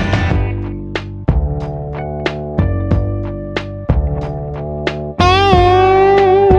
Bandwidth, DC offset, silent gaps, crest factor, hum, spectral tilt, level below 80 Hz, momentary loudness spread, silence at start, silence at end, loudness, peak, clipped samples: 8 kHz; under 0.1%; none; 14 dB; none; -7 dB/octave; -22 dBFS; 14 LU; 0 s; 0 s; -15 LUFS; 0 dBFS; under 0.1%